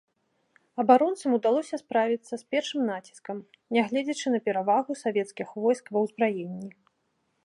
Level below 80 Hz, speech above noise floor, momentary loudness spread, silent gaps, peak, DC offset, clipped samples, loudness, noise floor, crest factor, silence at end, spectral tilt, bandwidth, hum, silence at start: -82 dBFS; 48 dB; 17 LU; none; -6 dBFS; under 0.1%; under 0.1%; -27 LUFS; -74 dBFS; 22 dB; 0.75 s; -5 dB/octave; 11.5 kHz; none; 0.75 s